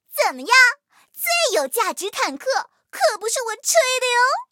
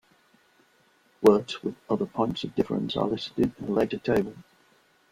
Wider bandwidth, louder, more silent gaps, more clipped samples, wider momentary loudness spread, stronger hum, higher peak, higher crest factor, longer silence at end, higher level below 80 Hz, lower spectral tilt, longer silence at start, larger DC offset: about the same, 17.5 kHz vs 16 kHz; first, -19 LUFS vs -27 LUFS; neither; neither; about the same, 11 LU vs 9 LU; neither; first, -2 dBFS vs -6 dBFS; about the same, 18 dB vs 22 dB; second, 0.1 s vs 0.7 s; second, -84 dBFS vs -58 dBFS; second, 2.5 dB/octave vs -6.5 dB/octave; second, 0.1 s vs 1.2 s; neither